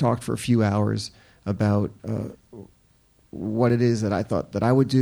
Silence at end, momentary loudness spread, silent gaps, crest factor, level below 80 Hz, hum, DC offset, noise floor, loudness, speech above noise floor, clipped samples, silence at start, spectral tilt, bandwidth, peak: 0 s; 16 LU; none; 16 dB; -56 dBFS; none; under 0.1%; -60 dBFS; -24 LUFS; 37 dB; under 0.1%; 0 s; -7.5 dB/octave; 19.5 kHz; -8 dBFS